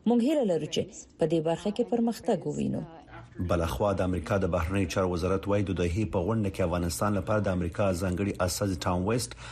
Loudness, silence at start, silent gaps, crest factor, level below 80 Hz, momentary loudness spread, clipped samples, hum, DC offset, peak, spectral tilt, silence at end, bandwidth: -29 LUFS; 0.05 s; none; 14 dB; -46 dBFS; 5 LU; under 0.1%; none; under 0.1%; -14 dBFS; -6 dB/octave; 0 s; 13 kHz